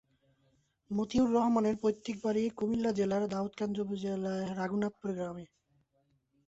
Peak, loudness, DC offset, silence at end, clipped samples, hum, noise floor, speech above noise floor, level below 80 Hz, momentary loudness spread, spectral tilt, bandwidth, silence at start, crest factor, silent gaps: -18 dBFS; -33 LUFS; under 0.1%; 1.05 s; under 0.1%; none; -75 dBFS; 43 dB; -64 dBFS; 9 LU; -7 dB/octave; 8 kHz; 0.9 s; 16 dB; none